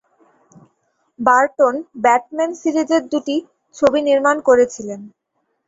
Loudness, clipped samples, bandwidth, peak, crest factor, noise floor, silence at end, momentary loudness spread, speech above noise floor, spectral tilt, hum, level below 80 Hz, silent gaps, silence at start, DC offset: -17 LUFS; under 0.1%; 8 kHz; -2 dBFS; 16 dB; -66 dBFS; 0.6 s; 10 LU; 50 dB; -4 dB/octave; none; -58 dBFS; none; 1.2 s; under 0.1%